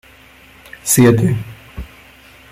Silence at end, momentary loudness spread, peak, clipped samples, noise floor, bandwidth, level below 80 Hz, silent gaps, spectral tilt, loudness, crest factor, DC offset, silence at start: 0.65 s; 23 LU; 0 dBFS; under 0.1%; -44 dBFS; 15.5 kHz; -40 dBFS; none; -5.5 dB/octave; -14 LUFS; 18 dB; under 0.1%; 0.85 s